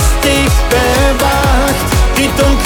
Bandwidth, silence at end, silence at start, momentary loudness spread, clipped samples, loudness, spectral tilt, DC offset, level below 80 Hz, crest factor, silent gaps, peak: 19 kHz; 0 s; 0 s; 2 LU; under 0.1%; -11 LUFS; -4.5 dB/octave; under 0.1%; -14 dBFS; 10 dB; none; 0 dBFS